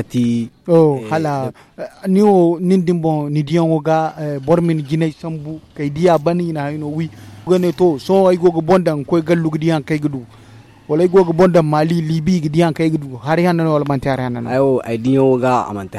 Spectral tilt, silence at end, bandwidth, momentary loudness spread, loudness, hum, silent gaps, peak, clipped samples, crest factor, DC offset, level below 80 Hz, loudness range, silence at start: -8 dB/octave; 0 s; 13 kHz; 11 LU; -16 LUFS; none; none; -2 dBFS; under 0.1%; 14 dB; under 0.1%; -48 dBFS; 3 LU; 0 s